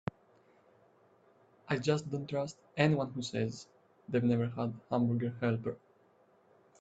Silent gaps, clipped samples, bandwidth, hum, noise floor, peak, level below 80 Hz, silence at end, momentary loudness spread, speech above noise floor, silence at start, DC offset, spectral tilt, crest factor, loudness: none; under 0.1%; 8.2 kHz; none; -67 dBFS; -12 dBFS; -70 dBFS; 1.05 s; 10 LU; 34 dB; 1.65 s; under 0.1%; -7 dB/octave; 24 dB; -34 LUFS